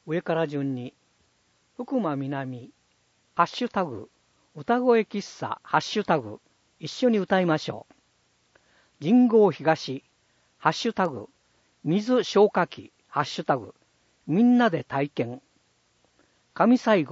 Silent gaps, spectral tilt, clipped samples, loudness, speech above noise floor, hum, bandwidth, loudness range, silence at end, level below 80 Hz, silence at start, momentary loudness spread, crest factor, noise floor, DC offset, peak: none; -6 dB/octave; under 0.1%; -25 LUFS; 43 dB; none; 7.8 kHz; 6 LU; 0 s; -72 dBFS; 0.05 s; 18 LU; 20 dB; -67 dBFS; under 0.1%; -6 dBFS